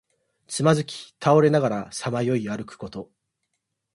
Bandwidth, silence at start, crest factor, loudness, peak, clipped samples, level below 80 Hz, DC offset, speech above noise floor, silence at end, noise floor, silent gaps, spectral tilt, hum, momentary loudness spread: 11.5 kHz; 0.5 s; 20 dB; -23 LUFS; -6 dBFS; under 0.1%; -62 dBFS; under 0.1%; 56 dB; 0.9 s; -79 dBFS; none; -6 dB/octave; none; 18 LU